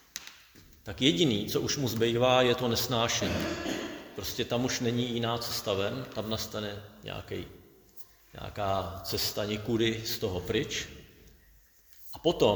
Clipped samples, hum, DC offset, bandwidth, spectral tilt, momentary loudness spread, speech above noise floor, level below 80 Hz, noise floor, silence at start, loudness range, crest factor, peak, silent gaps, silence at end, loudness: under 0.1%; none; under 0.1%; over 20 kHz; -4 dB/octave; 19 LU; 30 dB; -54 dBFS; -60 dBFS; 0.15 s; 8 LU; 22 dB; -10 dBFS; none; 0 s; -30 LUFS